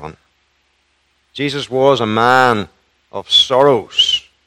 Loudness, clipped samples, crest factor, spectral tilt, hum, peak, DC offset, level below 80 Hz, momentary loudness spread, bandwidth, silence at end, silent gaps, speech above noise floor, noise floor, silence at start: -13 LUFS; 0.2%; 16 dB; -4 dB/octave; none; 0 dBFS; under 0.1%; -54 dBFS; 20 LU; 15.5 kHz; 0.25 s; none; 48 dB; -61 dBFS; 0 s